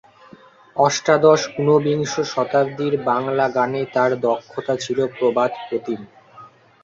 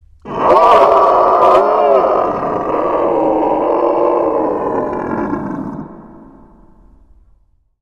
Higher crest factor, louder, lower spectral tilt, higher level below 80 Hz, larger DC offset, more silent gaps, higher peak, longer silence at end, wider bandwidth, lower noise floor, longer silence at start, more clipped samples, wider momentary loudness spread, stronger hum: about the same, 18 dB vs 14 dB; second, -19 LUFS vs -13 LUFS; second, -5 dB/octave vs -7 dB/octave; second, -62 dBFS vs -44 dBFS; second, under 0.1% vs 0.1%; neither; about the same, -2 dBFS vs 0 dBFS; second, 0.35 s vs 1.7 s; second, 7.6 kHz vs 10 kHz; second, -47 dBFS vs -53 dBFS; first, 0.75 s vs 0.25 s; neither; second, 10 LU vs 13 LU; neither